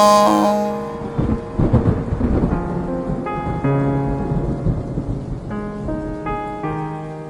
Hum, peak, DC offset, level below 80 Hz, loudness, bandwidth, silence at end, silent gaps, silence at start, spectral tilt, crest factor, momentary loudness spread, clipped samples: none; -2 dBFS; under 0.1%; -30 dBFS; -20 LUFS; 18 kHz; 0 s; none; 0 s; -7 dB/octave; 18 dB; 10 LU; under 0.1%